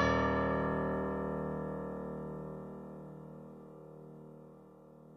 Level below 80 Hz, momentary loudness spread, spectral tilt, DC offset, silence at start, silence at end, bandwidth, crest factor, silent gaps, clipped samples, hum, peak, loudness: -52 dBFS; 22 LU; -7.5 dB/octave; under 0.1%; 0 s; 0 s; 6.6 kHz; 20 dB; none; under 0.1%; none; -18 dBFS; -37 LUFS